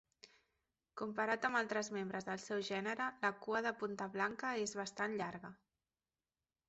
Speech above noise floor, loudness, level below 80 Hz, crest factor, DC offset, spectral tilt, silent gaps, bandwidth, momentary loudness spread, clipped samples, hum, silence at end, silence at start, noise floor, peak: over 49 dB; -40 LUFS; -80 dBFS; 20 dB; under 0.1%; -2.5 dB/octave; none; 8 kHz; 8 LU; under 0.1%; none; 1.15 s; 0.25 s; under -90 dBFS; -22 dBFS